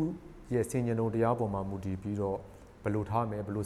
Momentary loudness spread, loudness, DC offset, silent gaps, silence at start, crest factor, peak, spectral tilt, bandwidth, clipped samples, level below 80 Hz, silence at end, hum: 9 LU; -33 LUFS; under 0.1%; none; 0 s; 16 dB; -16 dBFS; -8 dB/octave; 13.5 kHz; under 0.1%; -54 dBFS; 0 s; none